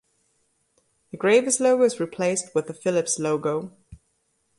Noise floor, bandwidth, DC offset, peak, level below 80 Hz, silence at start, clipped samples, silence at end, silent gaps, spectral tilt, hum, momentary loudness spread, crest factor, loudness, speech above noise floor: -71 dBFS; 11.5 kHz; under 0.1%; -6 dBFS; -62 dBFS; 1.15 s; under 0.1%; 0.65 s; none; -4 dB/octave; none; 10 LU; 18 dB; -23 LUFS; 48 dB